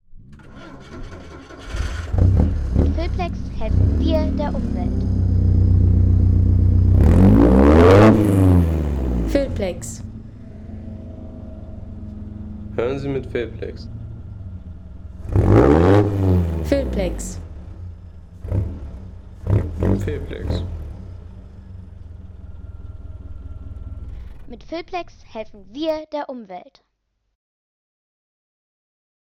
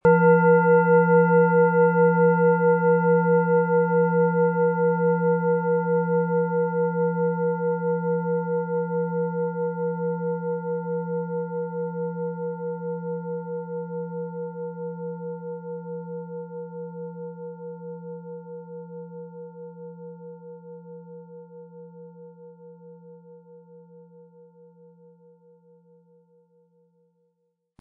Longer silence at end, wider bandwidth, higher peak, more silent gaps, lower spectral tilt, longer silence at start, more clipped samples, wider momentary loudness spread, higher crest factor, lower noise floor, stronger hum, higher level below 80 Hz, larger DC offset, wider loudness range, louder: second, 2.65 s vs 3.8 s; first, 11 kHz vs 2.8 kHz; about the same, -4 dBFS vs -6 dBFS; neither; second, -8.5 dB/octave vs -13.5 dB/octave; about the same, 0.15 s vs 0.05 s; neither; about the same, 25 LU vs 23 LU; about the same, 16 dB vs 18 dB; about the same, -72 dBFS vs -74 dBFS; neither; first, -26 dBFS vs -68 dBFS; neither; second, 20 LU vs 23 LU; first, -18 LUFS vs -23 LUFS